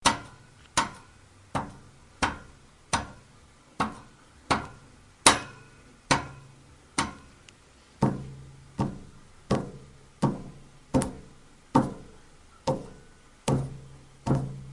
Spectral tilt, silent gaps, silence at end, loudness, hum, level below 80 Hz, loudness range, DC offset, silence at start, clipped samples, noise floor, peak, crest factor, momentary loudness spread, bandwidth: -4 dB/octave; none; 0 s; -29 LUFS; none; -50 dBFS; 7 LU; under 0.1%; 0 s; under 0.1%; -56 dBFS; 0 dBFS; 32 dB; 21 LU; 11.5 kHz